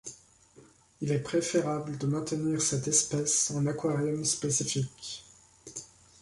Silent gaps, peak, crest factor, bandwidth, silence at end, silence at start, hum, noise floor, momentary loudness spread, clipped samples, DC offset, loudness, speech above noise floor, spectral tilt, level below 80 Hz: none; -10 dBFS; 22 dB; 11.5 kHz; 0.35 s; 0.05 s; none; -58 dBFS; 17 LU; under 0.1%; under 0.1%; -29 LUFS; 29 dB; -4 dB/octave; -64 dBFS